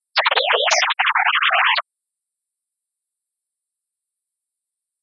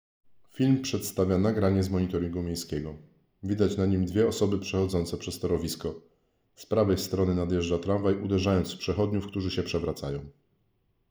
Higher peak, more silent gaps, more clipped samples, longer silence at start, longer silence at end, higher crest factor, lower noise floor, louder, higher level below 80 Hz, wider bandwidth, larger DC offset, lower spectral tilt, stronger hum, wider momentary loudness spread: first, -2 dBFS vs -10 dBFS; neither; neither; second, 0.15 s vs 0.55 s; first, 3.2 s vs 0.8 s; about the same, 20 dB vs 18 dB; first, -84 dBFS vs -71 dBFS; first, -16 LUFS vs -28 LUFS; second, under -90 dBFS vs -54 dBFS; second, 7.6 kHz vs over 20 kHz; neither; second, 5.5 dB/octave vs -6.5 dB/octave; neither; second, 3 LU vs 9 LU